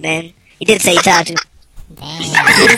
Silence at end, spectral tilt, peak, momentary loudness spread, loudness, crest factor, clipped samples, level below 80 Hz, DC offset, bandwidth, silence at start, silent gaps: 0 s; -2.5 dB/octave; 0 dBFS; 15 LU; -11 LUFS; 14 dB; 0.2%; -44 dBFS; under 0.1%; 18 kHz; 0 s; none